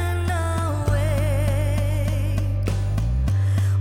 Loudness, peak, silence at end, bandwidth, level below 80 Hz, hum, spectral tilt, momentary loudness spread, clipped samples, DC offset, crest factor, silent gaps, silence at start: -23 LUFS; -10 dBFS; 0 s; 15 kHz; -28 dBFS; none; -6.5 dB/octave; 3 LU; under 0.1%; under 0.1%; 12 dB; none; 0 s